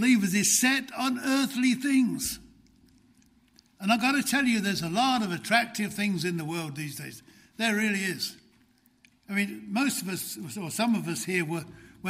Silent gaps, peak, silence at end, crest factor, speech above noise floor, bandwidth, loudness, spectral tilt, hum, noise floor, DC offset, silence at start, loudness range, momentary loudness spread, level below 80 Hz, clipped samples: none; -8 dBFS; 0 s; 20 dB; 36 dB; 16 kHz; -27 LUFS; -3.5 dB/octave; none; -64 dBFS; under 0.1%; 0 s; 5 LU; 12 LU; -64 dBFS; under 0.1%